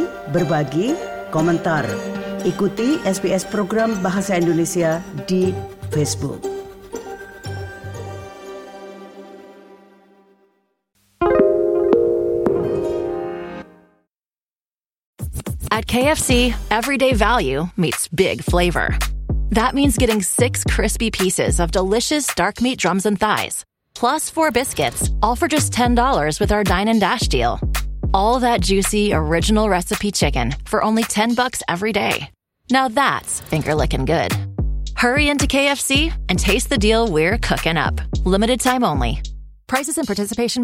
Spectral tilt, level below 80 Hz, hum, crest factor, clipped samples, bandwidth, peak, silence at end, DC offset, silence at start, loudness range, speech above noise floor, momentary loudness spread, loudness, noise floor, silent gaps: -4.5 dB/octave; -30 dBFS; none; 18 dB; under 0.1%; 17 kHz; -2 dBFS; 0 s; under 0.1%; 0 s; 8 LU; over 72 dB; 13 LU; -18 LUFS; under -90 dBFS; 14.43-14.47 s, 14.61-14.65 s, 15.06-15.13 s